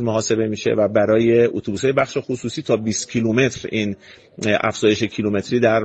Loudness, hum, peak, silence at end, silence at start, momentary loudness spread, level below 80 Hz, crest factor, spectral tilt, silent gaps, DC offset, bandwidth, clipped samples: -19 LUFS; none; -2 dBFS; 0 s; 0 s; 8 LU; -54 dBFS; 16 dB; -5 dB/octave; none; under 0.1%; 9 kHz; under 0.1%